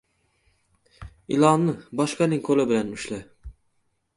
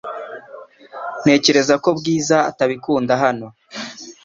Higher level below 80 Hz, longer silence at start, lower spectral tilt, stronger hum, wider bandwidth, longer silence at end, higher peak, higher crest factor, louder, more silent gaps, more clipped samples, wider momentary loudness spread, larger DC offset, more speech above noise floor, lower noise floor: first, -52 dBFS vs -60 dBFS; first, 1 s vs 0.05 s; first, -6 dB/octave vs -4 dB/octave; neither; first, 11.5 kHz vs 7.8 kHz; first, 0.65 s vs 0.1 s; about the same, -4 dBFS vs -2 dBFS; about the same, 22 dB vs 18 dB; second, -23 LUFS vs -16 LUFS; neither; neither; second, 15 LU vs 18 LU; neither; first, 48 dB vs 23 dB; first, -70 dBFS vs -40 dBFS